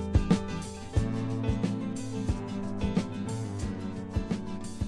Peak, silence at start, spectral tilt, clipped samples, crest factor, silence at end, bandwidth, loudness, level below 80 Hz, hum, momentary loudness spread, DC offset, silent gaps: -10 dBFS; 0 s; -7 dB/octave; under 0.1%; 20 dB; 0 s; 12 kHz; -32 LUFS; -38 dBFS; none; 6 LU; under 0.1%; none